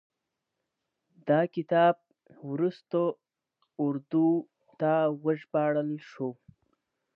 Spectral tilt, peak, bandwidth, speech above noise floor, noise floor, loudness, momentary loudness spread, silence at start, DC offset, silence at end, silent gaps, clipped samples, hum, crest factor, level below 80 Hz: -9.5 dB/octave; -12 dBFS; 5.6 kHz; 58 dB; -85 dBFS; -29 LUFS; 12 LU; 1.25 s; under 0.1%; 0.85 s; none; under 0.1%; none; 18 dB; -82 dBFS